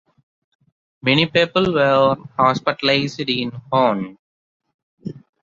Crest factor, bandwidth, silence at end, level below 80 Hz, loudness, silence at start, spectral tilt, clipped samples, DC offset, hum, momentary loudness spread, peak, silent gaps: 18 dB; 7.4 kHz; 0.25 s; -56 dBFS; -18 LUFS; 1.05 s; -6 dB/octave; under 0.1%; under 0.1%; none; 18 LU; -2 dBFS; 4.19-4.60 s, 4.74-4.97 s